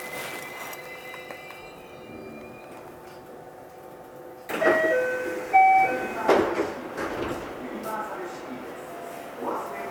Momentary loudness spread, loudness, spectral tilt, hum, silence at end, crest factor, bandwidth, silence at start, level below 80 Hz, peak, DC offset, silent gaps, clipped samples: 22 LU; -26 LUFS; -4.5 dB/octave; none; 0 s; 22 dB; over 20 kHz; 0 s; -60 dBFS; -6 dBFS; under 0.1%; none; under 0.1%